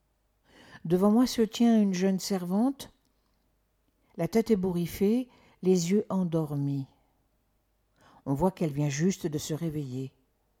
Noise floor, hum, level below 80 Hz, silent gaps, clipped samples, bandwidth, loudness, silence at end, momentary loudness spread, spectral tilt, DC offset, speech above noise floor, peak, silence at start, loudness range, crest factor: -72 dBFS; none; -58 dBFS; none; under 0.1%; 17 kHz; -28 LUFS; 0.5 s; 17 LU; -6.5 dB/octave; under 0.1%; 45 dB; -12 dBFS; 0.7 s; 5 LU; 16 dB